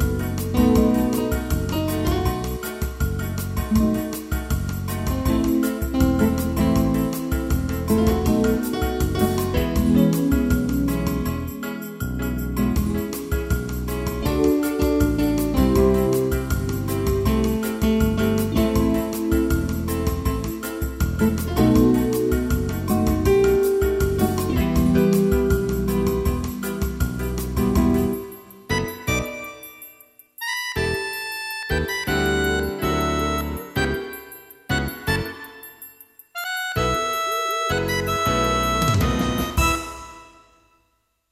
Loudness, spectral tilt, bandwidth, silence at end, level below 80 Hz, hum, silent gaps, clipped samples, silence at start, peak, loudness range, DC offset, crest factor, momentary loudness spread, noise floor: -22 LUFS; -6 dB/octave; 16 kHz; 1.05 s; -30 dBFS; none; none; under 0.1%; 0 s; -4 dBFS; 6 LU; under 0.1%; 18 dB; 10 LU; -68 dBFS